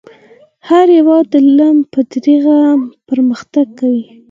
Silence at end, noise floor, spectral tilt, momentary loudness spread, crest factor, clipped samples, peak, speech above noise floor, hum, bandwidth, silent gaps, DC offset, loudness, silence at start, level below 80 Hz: 0.3 s; -44 dBFS; -6.5 dB/octave; 8 LU; 10 dB; under 0.1%; 0 dBFS; 34 dB; none; 7.4 kHz; none; under 0.1%; -11 LUFS; 0.65 s; -66 dBFS